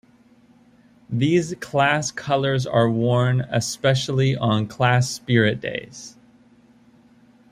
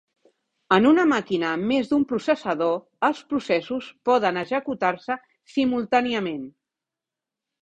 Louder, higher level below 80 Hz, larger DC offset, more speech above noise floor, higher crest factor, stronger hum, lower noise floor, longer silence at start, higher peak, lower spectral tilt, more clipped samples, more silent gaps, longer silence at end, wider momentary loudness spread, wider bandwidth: about the same, -21 LUFS vs -23 LUFS; first, -58 dBFS vs -64 dBFS; neither; second, 34 dB vs 65 dB; about the same, 20 dB vs 20 dB; neither; second, -54 dBFS vs -88 dBFS; first, 1.1 s vs 0.7 s; about the same, -2 dBFS vs -4 dBFS; about the same, -5.5 dB/octave vs -6 dB/octave; neither; neither; first, 1.4 s vs 1.1 s; about the same, 10 LU vs 11 LU; first, 14.5 kHz vs 8.6 kHz